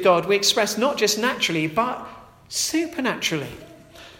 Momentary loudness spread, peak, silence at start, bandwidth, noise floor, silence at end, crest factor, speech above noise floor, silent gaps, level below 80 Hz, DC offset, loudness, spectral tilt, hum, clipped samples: 14 LU; -4 dBFS; 0 s; 16.5 kHz; -45 dBFS; 0.05 s; 18 dB; 23 dB; none; -58 dBFS; under 0.1%; -21 LUFS; -2.5 dB/octave; none; under 0.1%